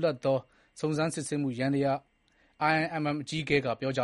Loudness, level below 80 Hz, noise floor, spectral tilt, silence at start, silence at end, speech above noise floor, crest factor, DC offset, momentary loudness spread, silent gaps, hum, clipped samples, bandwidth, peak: -30 LUFS; -64 dBFS; -67 dBFS; -5.5 dB/octave; 0 s; 0 s; 38 dB; 18 dB; under 0.1%; 5 LU; none; none; under 0.1%; 11.5 kHz; -12 dBFS